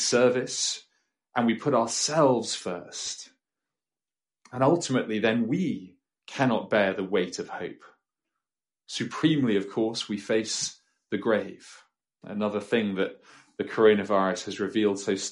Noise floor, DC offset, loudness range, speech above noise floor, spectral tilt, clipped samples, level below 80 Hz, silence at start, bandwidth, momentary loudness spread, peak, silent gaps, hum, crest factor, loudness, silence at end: under -90 dBFS; under 0.1%; 3 LU; over 64 dB; -4 dB/octave; under 0.1%; -72 dBFS; 0 s; 11.5 kHz; 14 LU; -8 dBFS; none; none; 20 dB; -27 LUFS; 0 s